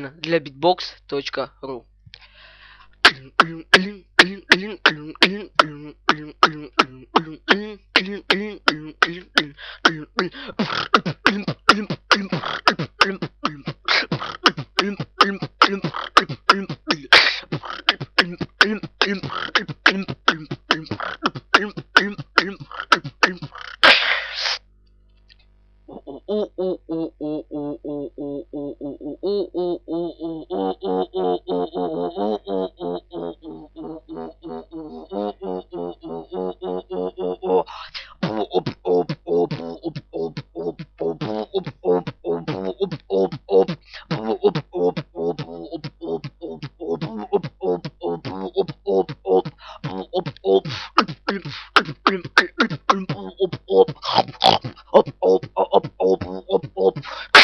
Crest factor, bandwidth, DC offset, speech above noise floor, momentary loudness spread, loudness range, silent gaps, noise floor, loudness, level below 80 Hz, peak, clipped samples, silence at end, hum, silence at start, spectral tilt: 22 dB; 12 kHz; under 0.1%; 32 dB; 14 LU; 10 LU; none; -54 dBFS; -21 LUFS; -54 dBFS; 0 dBFS; under 0.1%; 0 s; 50 Hz at -50 dBFS; 0 s; -4 dB/octave